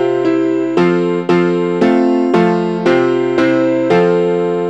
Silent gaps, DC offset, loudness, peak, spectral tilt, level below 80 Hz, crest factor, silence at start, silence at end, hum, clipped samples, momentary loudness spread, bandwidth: none; 0.2%; -13 LUFS; -2 dBFS; -7.5 dB/octave; -58 dBFS; 12 dB; 0 s; 0 s; none; under 0.1%; 3 LU; 8.2 kHz